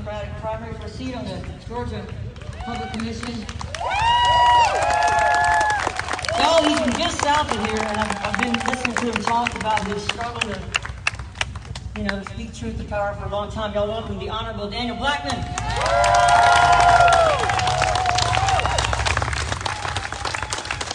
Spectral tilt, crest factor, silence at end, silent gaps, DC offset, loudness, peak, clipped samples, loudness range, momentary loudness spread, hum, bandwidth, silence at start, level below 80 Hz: -3.5 dB/octave; 20 dB; 0 s; none; under 0.1%; -21 LUFS; -2 dBFS; under 0.1%; 10 LU; 16 LU; none; 11 kHz; 0 s; -36 dBFS